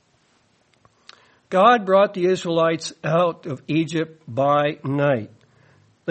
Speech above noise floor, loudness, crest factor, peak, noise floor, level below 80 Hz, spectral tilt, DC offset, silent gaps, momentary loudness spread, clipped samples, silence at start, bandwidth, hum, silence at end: 42 dB; -20 LUFS; 18 dB; -4 dBFS; -62 dBFS; -68 dBFS; -6 dB/octave; under 0.1%; none; 11 LU; under 0.1%; 1.5 s; 8.8 kHz; none; 0 s